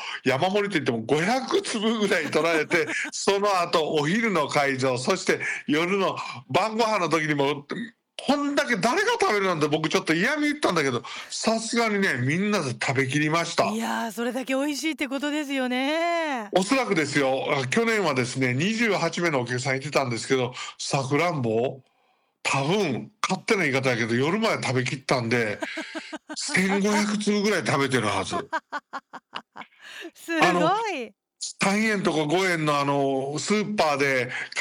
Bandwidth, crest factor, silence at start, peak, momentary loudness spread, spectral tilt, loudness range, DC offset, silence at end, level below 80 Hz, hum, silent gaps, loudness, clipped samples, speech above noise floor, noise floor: 17 kHz; 16 dB; 0 s; -8 dBFS; 9 LU; -4.5 dB/octave; 3 LU; under 0.1%; 0 s; -68 dBFS; none; none; -24 LUFS; under 0.1%; 43 dB; -68 dBFS